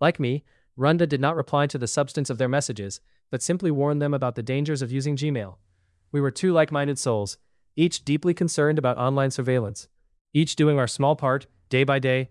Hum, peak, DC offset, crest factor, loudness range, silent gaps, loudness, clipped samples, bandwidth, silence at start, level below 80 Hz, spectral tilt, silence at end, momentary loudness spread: none; -6 dBFS; under 0.1%; 18 dB; 3 LU; 10.21-10.25 s; -24 LUFS; under 0.1%; 12 kHz; 0 s; -64 dBFS; -5.5 dB/octave; 0.05 s; 10 LU